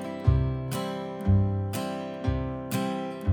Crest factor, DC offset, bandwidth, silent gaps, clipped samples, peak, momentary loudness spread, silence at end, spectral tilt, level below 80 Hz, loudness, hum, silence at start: 18 dB; under 0.1%; over 20 kHz; none; under 0.1%; -10 dBFS; 7 LU; 0 s; -7 dB/octave; -36 dBFS; -29 LUFS; none; 0 s